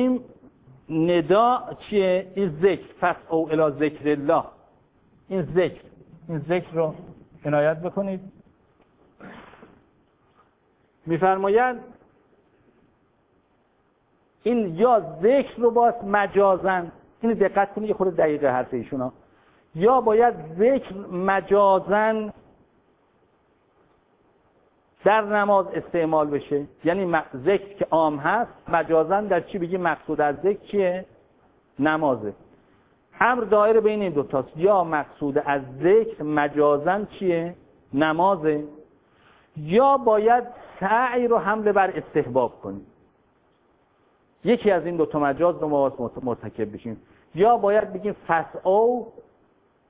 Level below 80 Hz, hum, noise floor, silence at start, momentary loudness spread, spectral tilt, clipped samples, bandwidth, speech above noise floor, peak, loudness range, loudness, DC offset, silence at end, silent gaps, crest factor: -58 dBFS; none; -65 dBFS; 0 s; 11 LU; -10.5 dB/octave; under 0.1%; 4 kHz; 43 dB; -2 dBFS; 6 LU; -22 LUFS; under 0.1%; 0.7 s; none; 20 dB